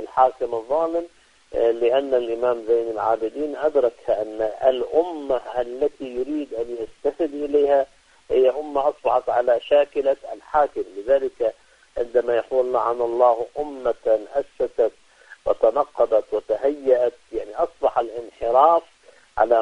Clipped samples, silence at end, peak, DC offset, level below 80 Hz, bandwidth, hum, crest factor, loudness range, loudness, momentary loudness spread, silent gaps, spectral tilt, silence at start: under 0.1%; 0 s; -2 dBFS; under 0.1%; -54 dBFS; 10 kHz; none; 20 dB; 3 LU; -22 LUFS; 10 LU; none; -5.5 dB/octave; 0 s